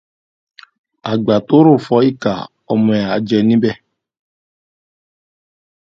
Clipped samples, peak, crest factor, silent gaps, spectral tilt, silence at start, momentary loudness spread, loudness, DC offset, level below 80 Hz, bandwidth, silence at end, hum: under 0.1%; 0 dBFS; 16 dB; none; -8 dB/octave; 1.05 s; 11 LU; -14 LUFS; under 0.1%; -56 dBFS; 7.2 kHz; 2.2 s; none